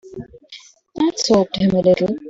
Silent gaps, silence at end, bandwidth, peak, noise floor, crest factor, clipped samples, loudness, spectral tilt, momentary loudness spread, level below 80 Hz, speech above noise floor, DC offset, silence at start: none; 0 s; 7.8 kHz; -2 dBFS; -43 dBFS; 16 dB; under 0.1%; -17 LUFS; -5.5 dB/octave; 21 LU; -50 dBFS; 27 dB; under 0.1%; 0.05 s